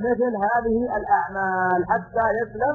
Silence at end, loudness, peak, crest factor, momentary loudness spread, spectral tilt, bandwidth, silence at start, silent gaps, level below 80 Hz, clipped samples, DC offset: 0 s; -22 LUFS; -8 dBFS; 14 dB; 2 LU; -10 dB/octave; 6.8 kHz; 0 s; none; -48 dBFS; under 0.1%; under 0.1%